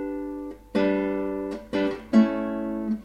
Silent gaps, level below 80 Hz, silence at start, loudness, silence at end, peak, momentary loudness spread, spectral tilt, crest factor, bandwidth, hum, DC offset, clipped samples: none; -52 dBFS; 0 s; -26 LUFS; 0 s; -8 dBFS; 11 LU; -7.5 dB/octave; 18 dB; 8.2 kHz; none; under 0.1%; under 0.1%